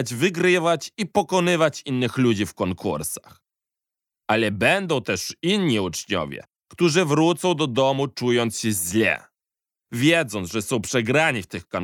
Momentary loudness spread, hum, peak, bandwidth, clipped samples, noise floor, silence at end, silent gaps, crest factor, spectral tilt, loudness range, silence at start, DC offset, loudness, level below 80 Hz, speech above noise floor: 8 LU; none; -4 dBFS; 17.5 kHz; under 0.1%; -89 dBFS; 0 s; none; 18 dB; -4.5 dB/octave; 3 LU; 0 s; under 0.1%; -22 LUFS; -62 dBFS; 67 dB